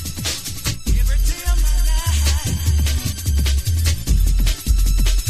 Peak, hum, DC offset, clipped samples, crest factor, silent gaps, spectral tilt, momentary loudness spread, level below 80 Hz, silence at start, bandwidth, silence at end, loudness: -6 dBFS; none; under 0.1%; under 0.1%; 12 dB; none; -3.5 dB/octave; 5 LU; -18 dBFS; 0 s; 15.5 kHz; 0 s; -20 LUFS